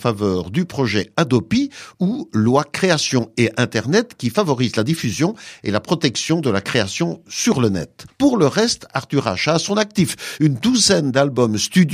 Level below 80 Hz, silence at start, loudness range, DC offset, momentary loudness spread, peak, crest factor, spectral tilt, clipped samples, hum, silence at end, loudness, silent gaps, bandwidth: -52 dBFS; 0 s; 2 LU; under 0.1%; 6 LU; -2 dBFS; 16 dB; -4.5 dB/octave; under 0.1%; none; 0 s; -18 LUFS; none; 15.5 kHz